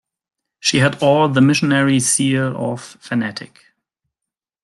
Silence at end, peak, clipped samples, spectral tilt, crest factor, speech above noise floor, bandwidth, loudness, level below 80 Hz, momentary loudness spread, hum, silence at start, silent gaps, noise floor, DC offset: 1.2 s; -2 dBFS; under 0.1%; -4.5 dB/octave; 16 dB; 69 dB; 12.5 kHz; -16 LUFS; -58 dBFS; 12 LU; none; 0.65 s; none; -85 dBFS; under 0.1%